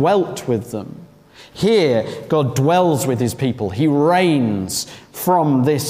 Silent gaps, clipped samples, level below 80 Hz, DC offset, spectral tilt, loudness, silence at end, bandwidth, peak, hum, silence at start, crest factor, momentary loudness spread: none; under 0.1%; -54 dBFS; under 0.1%; -6 dB/octave; -17 LUFS; 0 s; 16 kHz; -4 dBFS; none; 0 s; 14 dB; 9 LU